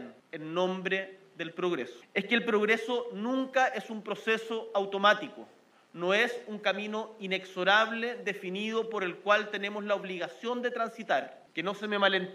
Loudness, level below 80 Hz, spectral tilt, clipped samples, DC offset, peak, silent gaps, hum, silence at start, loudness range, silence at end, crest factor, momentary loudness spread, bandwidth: -30 LUFS; -86 dBFS; -4.5 dB/octave; under 0.1%; under 0.1%; -10 dBFS; none; none; 0 s; 3 LU; 0 s; 22 dB; 11 LU; 14 kHz